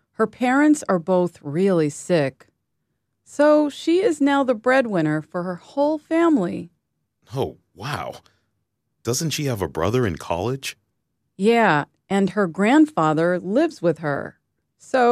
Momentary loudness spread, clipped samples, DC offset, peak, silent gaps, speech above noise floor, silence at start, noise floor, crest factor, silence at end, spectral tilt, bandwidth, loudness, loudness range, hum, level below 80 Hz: 12 LU; under 0.1%; under 0.1%; -4 dBFS; none; 55 dB; 0.2 s; -75 dBFS; 16 dB; 0 s; -5.5 dB/octave; 15 kHz; -21 LUFS; 6 LU; none; -56 dBFS